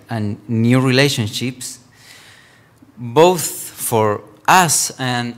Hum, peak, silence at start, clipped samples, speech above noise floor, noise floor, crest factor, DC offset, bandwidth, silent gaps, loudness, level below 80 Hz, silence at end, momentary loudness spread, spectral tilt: none; 0 dBFS; 0.1 s; under 0.1%; 33 dB; -48 dBFS; 18 dB; under 0.1%; 16.5 kHz; none; -16 LUFS; -60 dBFS; 0 s; 12 LU; -4 dB/octave